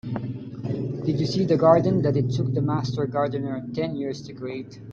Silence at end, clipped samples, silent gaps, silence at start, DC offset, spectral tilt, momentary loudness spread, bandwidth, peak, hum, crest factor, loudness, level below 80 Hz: 0 s; under 0.1%; none; 0.05 s; under 0.1%; -8 dB/octave; 16 LU; 7.4 kHz; -4 dBFS; none; 20 dB; -24 LUFS; -56 dBFS